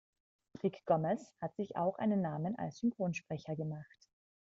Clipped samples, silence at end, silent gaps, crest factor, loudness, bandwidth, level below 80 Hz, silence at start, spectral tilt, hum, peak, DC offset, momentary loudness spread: under 0.1%; 0.6 s; none; 20 dB; -37 LUFS; 7.8 kHz; -76 dBFS; 0.55 s; -7.5 dB/octave; none; -18 dBFS; under 0.1%; 9 LU